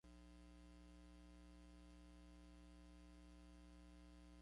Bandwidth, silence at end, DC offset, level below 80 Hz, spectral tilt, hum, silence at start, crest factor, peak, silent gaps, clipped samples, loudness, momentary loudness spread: 11 kHz; 0 s; under 0.1%; -66 dBFS; -5.5 dB/octave; 60 Hz at -65 dBFS; 0.05 s; 10 dB; -54 dBFS; none; under 0.1%; -65 LUFS; 0 LU